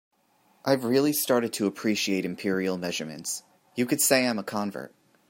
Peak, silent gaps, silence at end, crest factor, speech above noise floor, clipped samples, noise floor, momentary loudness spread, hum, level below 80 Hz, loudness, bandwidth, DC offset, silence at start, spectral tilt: -8 dBFS; none; 0.45 s; 20 dB; 39 dB; under 0.1%; -65 dBFS; 13 LU; none; -74 dBFS; -26 LUFS; 16.5 kHz; under 0.1%; 0.65 s; -3.5 dB/octave